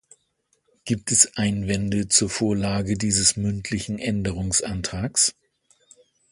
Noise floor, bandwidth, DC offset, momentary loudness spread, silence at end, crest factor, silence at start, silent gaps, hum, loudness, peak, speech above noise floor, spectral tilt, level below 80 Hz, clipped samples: -70 dBFS; 11.5 kHz; under 0.1%; 10 LU; 1 s; 24 dB; 0.85 s; none; none; -22 LUFS; -2 dBFS; 47 dB; -3 dB/octave; -44 dBFS; under 0.1%